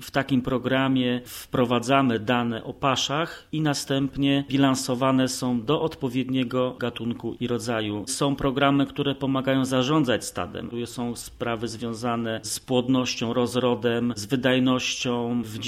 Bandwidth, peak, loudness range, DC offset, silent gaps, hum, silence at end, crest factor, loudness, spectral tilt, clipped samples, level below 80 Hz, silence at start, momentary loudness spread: 15.5 kHz; -4 dBFS; 3 LU; under 0.1%; none; none; 0 s; 20 dB; -25 LUFS; -5 dB/octave; under 0.1%; -52 dBFS; 0 s; 8 LU